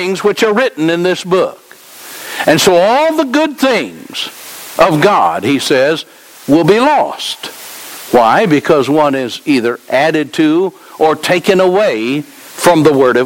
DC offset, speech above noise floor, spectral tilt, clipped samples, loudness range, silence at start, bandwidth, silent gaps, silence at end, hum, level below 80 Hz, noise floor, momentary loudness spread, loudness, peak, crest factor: under 0.1%; 23 dB; -4.5 dB/octave; under 0.1%; 1 LU; 0 s; 17 kHz; none; 0 s; none; -52 dBFS; -34 dBFS; 15 LU; -11 LUFS; 0 dBFS; 12 dB